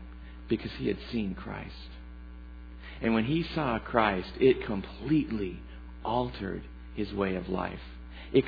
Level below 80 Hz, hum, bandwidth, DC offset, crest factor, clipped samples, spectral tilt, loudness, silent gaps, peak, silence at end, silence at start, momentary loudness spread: -46 dBFS; none; 5 kHz; under 0.1%; 24 dB; under 0.1%; -9 dB/octave; -31 LUFS; none; -8 dBFS; 0 s; 0 s; 20 LU